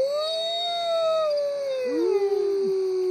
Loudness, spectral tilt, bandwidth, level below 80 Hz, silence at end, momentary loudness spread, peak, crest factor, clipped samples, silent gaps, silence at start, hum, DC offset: -25 LUFS; -3.5 dB/octave; 13 kHz; -86 dBFS; 0 s; 3 LU; -14 dBFS; 10 dB; under 0.1%; none; 0 s; none; under 0.1%